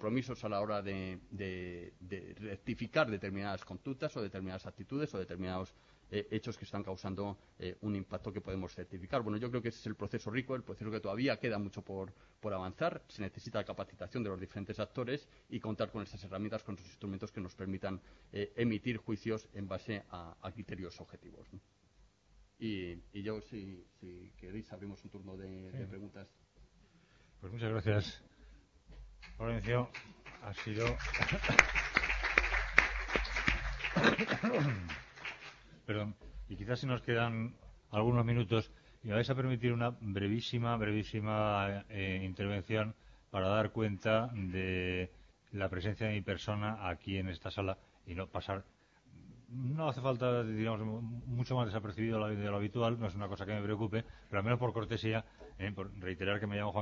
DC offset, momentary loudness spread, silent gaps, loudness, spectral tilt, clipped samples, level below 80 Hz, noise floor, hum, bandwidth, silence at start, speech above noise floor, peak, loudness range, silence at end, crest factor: under 0.1%; 15 LU; none; -37 LUFS; -5 dB/octave; under 0.1%; -54 dBFS; -68 dBFS; none; 7.4 kHz; 0 s; 30 dB; -6 dBFS; 13 LU; 0 s; 30 dB